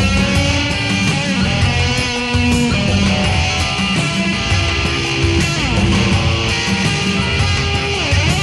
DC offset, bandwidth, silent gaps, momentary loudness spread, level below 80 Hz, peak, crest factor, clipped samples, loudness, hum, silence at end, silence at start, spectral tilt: under 0.1%; 12 kHz; none; 2 LU; -26 dBFS; -2 dBFS; 12 dB; under 0.1%; -15 LUFS; none; 0 s; 0 s; -4.5 dB/octave